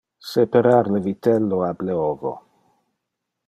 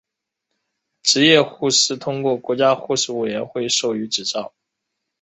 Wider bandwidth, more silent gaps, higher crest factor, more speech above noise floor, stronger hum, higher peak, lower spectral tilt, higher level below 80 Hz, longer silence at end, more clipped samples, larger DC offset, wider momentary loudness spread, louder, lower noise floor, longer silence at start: first, 13.5 kHz vs 8.4 kHz; neither; about the same, 18 dB vs 20 dB; about the same, 61 dB vs 60 dB; neither; second, -4 dBFS vs 0 dBFS; first, -8 dB/octave vs -2.5 dB/octave; about the same, -62 dBFS vs -64 dBFS; first, 1.1 s vs 0.75 s; neither; neither; about the same, 12 LU vs 11 LU; about the same, -20 LUFS vs -18 LUFS; about the same, -80 dBFS vs -79 dBFS; second, 0.25 s vs 1.05 s